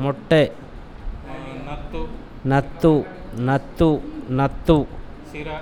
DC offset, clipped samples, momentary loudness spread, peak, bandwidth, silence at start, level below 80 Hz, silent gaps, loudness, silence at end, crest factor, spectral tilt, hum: under 0.1%; under 0.1%; 19 LU; -2 dBFS; 16.5 kHz; 0 s; -34 dBFS; none; -21 LUFS; 0 s; 20 dB; -8 dB/octave; none